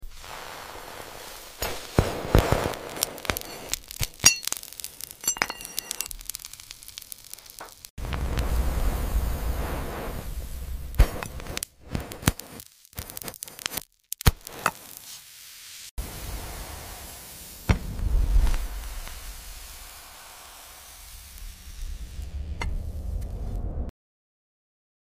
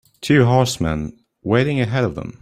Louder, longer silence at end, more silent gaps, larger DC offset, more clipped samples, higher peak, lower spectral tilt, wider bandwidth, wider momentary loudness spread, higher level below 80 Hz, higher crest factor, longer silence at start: second, -30 LUFS vs -18 LUFS; first, 1.15 s vs 0.1 s; first, 7.90-7.97 s, 15.91-15.97 s vs none; neither; neither; about the same, -2 dBFS vs -2 dBFS; second, -3.5 dB/octave vs -6 dB/octave; about the same, 16 kHz vs 15 kHz; first, 16 LU vs 12 LU; first, -32 dBFS vs -42 dBFS; first, 28 dB vs 16 dB; second, 0 s vs 0.2 s